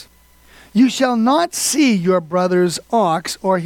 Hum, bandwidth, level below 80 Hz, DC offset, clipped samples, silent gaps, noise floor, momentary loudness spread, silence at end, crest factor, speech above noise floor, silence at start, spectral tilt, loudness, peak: none; 18 kHz; -56 dBFS; under 0.1%; under 0.1%; none; -49 dBFS; 4 LU; 0 s; 14 dB; 33 dB; 0 s; -4.5 dB/octave; -16 LUFS; -4 dBFS